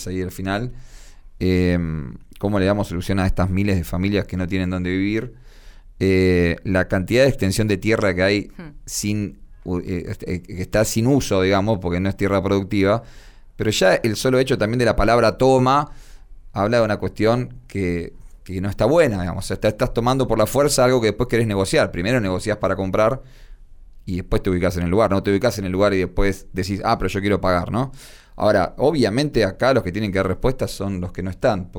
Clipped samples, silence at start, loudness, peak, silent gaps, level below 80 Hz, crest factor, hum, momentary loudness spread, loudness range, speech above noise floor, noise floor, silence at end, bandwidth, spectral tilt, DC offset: under 0.1%; 0 s; -20 LUFS; -4 dBFS; none; -34 dBFS; 16 dB; none; 11 LU; 4 LU; 23 dB; -42 dBFS; 0 s; over 20 kHz; -6 dB/octave; under 0.1%